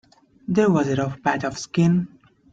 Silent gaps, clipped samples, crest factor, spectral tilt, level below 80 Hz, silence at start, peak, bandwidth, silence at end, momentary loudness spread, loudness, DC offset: none; under 0.1%; 16 dB; -7 dB/octave; -56 dBFS; 0.5 s; -6 dBFS; 7.8 kHz; 0.45 s; 8 LU; -22 LUFS; under 0.1%